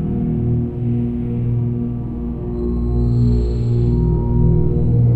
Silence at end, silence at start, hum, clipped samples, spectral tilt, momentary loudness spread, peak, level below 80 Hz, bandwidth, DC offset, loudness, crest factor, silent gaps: 0 s; 0 s; 60 Hz at -25 dBFS; under 0.1%; -12 dB/octave; 7 LU; -4 dBFS; -24 dBFS; 4.5 kHz; under 0.1%; -19 LUFS; 12 dB; none